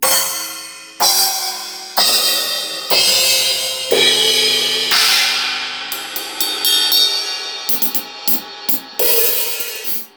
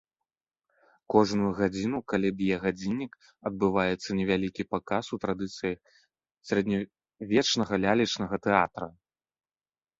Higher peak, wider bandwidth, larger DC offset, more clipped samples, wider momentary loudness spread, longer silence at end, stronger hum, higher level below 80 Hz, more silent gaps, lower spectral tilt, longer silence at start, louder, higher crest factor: first, -2 dBFS vs -6 dBFS; first, over 20 kHz vs 7.8 kHz; neither; neither; about the same, 11 LU vs 11 LU; second, 0.1 s vs 1.1 s; neither; about the same, -62 dBFS vs -58 dBFS; neither; second, 1 dB/octave vs -5 dB/octave; second, 0 s vs 1.1 s; first, -14 LUFS vs -28 LUFS; second, 16 dB vs 24 dB